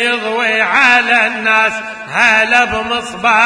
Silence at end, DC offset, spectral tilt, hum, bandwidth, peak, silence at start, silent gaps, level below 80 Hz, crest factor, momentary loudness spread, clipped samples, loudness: 0 s; under 0.1%; -2 dB/octave; none; 11 kHz; 0 dBFS; 0 s; none; -46 dBFS; 12 dB; 9 LU; 0.3%; -11 LUFS